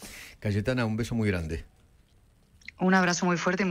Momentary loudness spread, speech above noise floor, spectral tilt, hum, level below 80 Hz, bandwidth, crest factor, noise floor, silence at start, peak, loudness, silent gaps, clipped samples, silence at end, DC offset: 17 LU; 35 dB; -5.5 dB/octave; none; -48 dBFS; 15.5 kHz; 20 dB; -61 dBFS; 0 s; -10 dBFS; -27 LUFS; none; under 0.1%; 0 s; under 0.1%